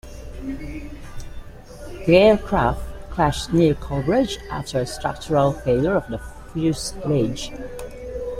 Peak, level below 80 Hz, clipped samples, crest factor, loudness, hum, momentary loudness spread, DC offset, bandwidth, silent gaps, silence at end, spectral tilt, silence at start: -2 dBFS; -36 dBFS; under 0.1%; 20 dB; -21 LUFS; none; 19 LU; under 0.1%; 16 kHz; none; 0 s; -6 dB/octave; 0.05 s